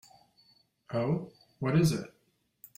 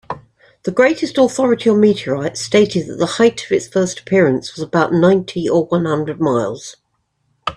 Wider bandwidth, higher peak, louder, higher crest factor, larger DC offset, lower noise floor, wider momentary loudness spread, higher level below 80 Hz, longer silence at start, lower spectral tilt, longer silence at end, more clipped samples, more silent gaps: first, 16 kHz vs 11 kHz; second, -14 dBFS vs 0 dBFS; second, -31 LUFS vs -16 LUFS; about the same, 18 dB vs 16 dB; neither; about the same, -66 dBFS vs -66 dBFS; first, 18 LU vs 10 LU; second, -64 dBFS vs -54 dBFS; first, 0.9 s vs 0.1 s; about the same, -6.5 dB/octave vs -5.5 dB/octave; first, 0.7 s vs 0 s; neither; neither